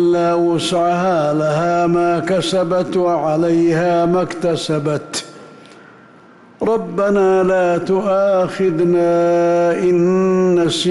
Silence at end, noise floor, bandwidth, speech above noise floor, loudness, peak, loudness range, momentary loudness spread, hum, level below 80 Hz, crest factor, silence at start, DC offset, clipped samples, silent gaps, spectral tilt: 0 s; -44 dBFS; 12 kHz; 29 dB; -16 LUFS; -8 dBFS; 5 LU; 5 LU; none; -52 dBFS; 8 dB; 0 s; under 0.1%; under 0.1%; none; -6 dB/octave